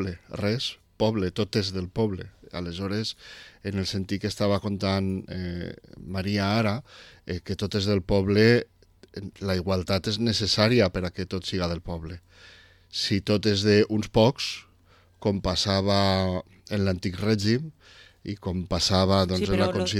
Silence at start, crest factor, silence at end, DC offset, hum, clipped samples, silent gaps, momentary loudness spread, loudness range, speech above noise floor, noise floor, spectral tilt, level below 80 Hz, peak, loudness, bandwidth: 0 s; 20 dB; 0 s; under 0.1%; none; under 0.1%; none; 15 LU; 5 LU; 33 dB; -58 dBFS; -5.5 dB/octave; -48 dBFS; -6 dBFS; -26 LUFS; 14.5 kHz